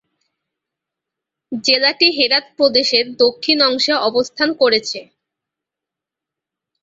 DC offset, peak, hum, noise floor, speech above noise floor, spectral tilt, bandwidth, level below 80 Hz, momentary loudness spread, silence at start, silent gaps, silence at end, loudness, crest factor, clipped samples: under 0.1%; 0 dBFS; none; -85 dBFS; 69 dB; -2 dB/octave; 7.8 kHz; -64 dBFS; 7 LU; 1.5 s; none; 1.8 s; -14 LUFS; 18 dB; under 0.1%